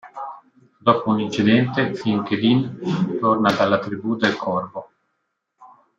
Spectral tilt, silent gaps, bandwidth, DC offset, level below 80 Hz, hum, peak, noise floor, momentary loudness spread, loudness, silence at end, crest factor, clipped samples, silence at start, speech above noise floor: -6.5 dB/octave; none; 7.6 kHz; under 0.1%; -64 dBFS; none; -2 dBFS; -74 dBFS; 12 LU; -20 LUFS; 0.3 s; 18 dB; under 0.1%; 0.05 s; 55 dB